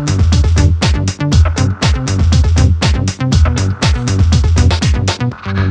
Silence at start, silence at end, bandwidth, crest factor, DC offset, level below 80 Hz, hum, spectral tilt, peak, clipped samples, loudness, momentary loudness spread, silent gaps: 0 s; 0 s; 9.6 kHz; 10 dB; under 0.1%; -16 dBFS; none; -5.5 dB/octave; 0 dBFS; under 0.1%; -13 LUFS; 4 LU; none